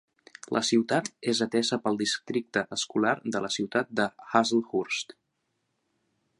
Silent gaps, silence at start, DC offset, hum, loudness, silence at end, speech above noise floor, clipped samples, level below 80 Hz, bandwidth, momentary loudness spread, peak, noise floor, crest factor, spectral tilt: none; 0.5 s; under 0.1%; none; -28 LUFS; 1.35 s; 50 dB; under 0.1%; -74 dBFS; 11 kHz; 6 LU; -6 dBFS; -78 dBFS; 24 dB; -3.5 dB/octave